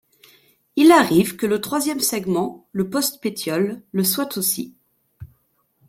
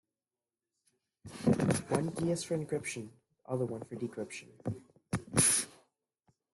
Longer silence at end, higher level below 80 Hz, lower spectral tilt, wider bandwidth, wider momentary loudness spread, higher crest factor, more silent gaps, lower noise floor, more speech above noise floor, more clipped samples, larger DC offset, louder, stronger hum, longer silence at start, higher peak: second, 0.6 s vs 0.85 s; first, -58 dBFS vs -64 dBFS; about the same, -4 dB/octave vs -4.5 dB/octave; first, 16.5 kHz vs 12.5 kHz; second, 13 LU vs 17 LU; about the same, 20 dB vs 24 dB; neither; second, -65 dBFS vs under -90 dBFS; second, 45 dB vs over 56 dB; neither; neither; first, -20 LUFS vs -33 LUFS; neither; second, 0.75 s vs 1.25 s; first, -2 dBFS vs -12 dBFS